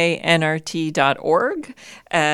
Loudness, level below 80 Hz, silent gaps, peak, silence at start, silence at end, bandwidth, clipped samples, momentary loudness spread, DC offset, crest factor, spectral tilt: -19 LUFS; -60 dBFS; none; 0 dBFS; 0 s; 0 s; 13 kHz; under 0.1%; 8 LU; under 0.1%; 18 dB; -4.5 dB/octave